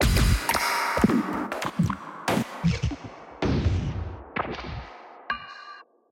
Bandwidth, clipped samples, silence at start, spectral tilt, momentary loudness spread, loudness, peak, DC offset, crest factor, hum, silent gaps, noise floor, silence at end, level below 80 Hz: 16.5 kHz; under 0.1%; 0 s; -5 dB/octave; 19 LU; -27 LUFS; -6 dBFS; under 0.1%; 20 dB; none; none; -47 dBFS; 0.3 s; -34 dBFS